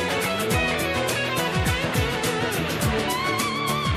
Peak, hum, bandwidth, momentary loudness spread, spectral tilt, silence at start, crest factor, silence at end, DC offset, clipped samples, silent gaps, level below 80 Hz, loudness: -10 dBFS; none; 15.5 kHz; 2 LU; -4 dB/octave; 0 s; 14 dB; 0 s; under 0.1%; under 0.1%; none; -38 dBFS; -23 LUFS